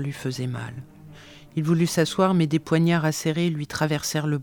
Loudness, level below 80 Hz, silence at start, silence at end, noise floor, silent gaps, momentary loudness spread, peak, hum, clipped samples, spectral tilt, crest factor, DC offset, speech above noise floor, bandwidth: -24 LUFS; -58 dBFS; 0 s; 0 s; -46 dBFS; none; 11 LU; -6 dBFS; none; under 0.1%; -5.5 dB/octave; 18 dB; under 0.1%; 22 dB; 19 kHz